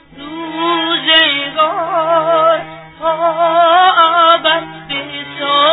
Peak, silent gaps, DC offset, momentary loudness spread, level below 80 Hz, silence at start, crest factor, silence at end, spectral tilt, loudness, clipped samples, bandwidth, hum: 0 dBFS; none; under 0.1%; 13 LU; -56 dBFS; 0.15 s; 12 dB; 0 s; -5.5 dB/octave; -12 LUFS; under 0.1%; 4.1 kHz; none